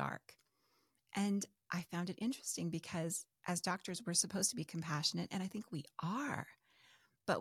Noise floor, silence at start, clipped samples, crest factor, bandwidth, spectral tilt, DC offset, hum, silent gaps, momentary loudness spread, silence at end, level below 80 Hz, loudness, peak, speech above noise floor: -79 dBFS; 0 s; under 0.1%; 22 dB; 16 kHz; -3.5 dB/octave; under 0.1%; none; none; 10 LU; 0 s; -78 dBFS; -40 LUFS; -20 dBFS; 38 dB